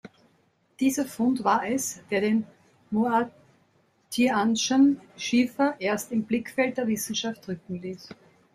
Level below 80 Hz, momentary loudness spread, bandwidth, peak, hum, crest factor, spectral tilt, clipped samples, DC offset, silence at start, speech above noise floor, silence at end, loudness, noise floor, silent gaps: -68 dBFS; 13 LU; 15.5 kHz; -8 dBFS; none; 18 dB; -4 dB/octave; under 0.1%; under 0.1%; 0.05 s; 41 dB; 0.4 s; -26 LUFS; -66 dBFS; none